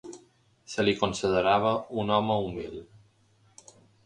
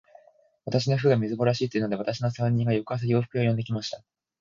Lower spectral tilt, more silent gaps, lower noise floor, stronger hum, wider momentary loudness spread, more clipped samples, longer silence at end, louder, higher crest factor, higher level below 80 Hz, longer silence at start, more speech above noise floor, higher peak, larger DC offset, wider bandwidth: second, -5 dB/octave vs -7 dB/octave; neither; first, -64 dBFS vs -60 dBFS; neither; first, 16 LU vs 8 LU; neither; first, 1.2 s vs 0.45 s; about the same, -27 LUFS vs -26 LUFS; about the same, 22 dB vs 18 dB; about the same, -56 dBFS vs -60 dBFS; second, 0.05 s vs 0.65 s; about the same, 37 dB vs 34 dB; first, -6 dBFS vs -10 dBFS; neither; first, 10.5 kHz vs 7.4 kHz